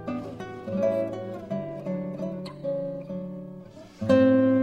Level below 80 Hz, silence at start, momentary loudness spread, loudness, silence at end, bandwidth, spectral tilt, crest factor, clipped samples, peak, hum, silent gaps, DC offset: -62 dBFS; 0 s; 18 LU; -27 LUFS; 0 s; 8.6 kHz; -8.5 dB/octave; 18 dB; under 0.1%; -8 dBFS; none; none; under 0.1%